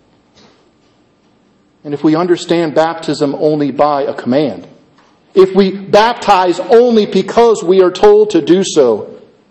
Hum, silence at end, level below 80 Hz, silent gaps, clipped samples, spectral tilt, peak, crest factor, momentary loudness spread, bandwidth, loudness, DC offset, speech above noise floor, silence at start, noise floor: none; 0.35 s; -48 dBFS; none; 0.2%; -5.5 dB/octave; 0 dBFS; 12 dB; 8 LU; 8.6 kHz; -11 LUFS; under 0.1%; 41 dB; 1.85 s; -52 dBFS